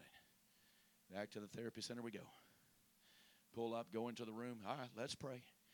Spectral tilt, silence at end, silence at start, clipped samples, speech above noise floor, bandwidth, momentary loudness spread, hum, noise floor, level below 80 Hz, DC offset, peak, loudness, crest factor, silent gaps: -4.5 dB/octave; 0 s; 0 s; under 0.1%; 26 dB; 19 kHz; 21 LU; none; -75 dBFS; -86 dBFS; under 0.1%; -28 dBFS; -50 LUFS; 24 dB; none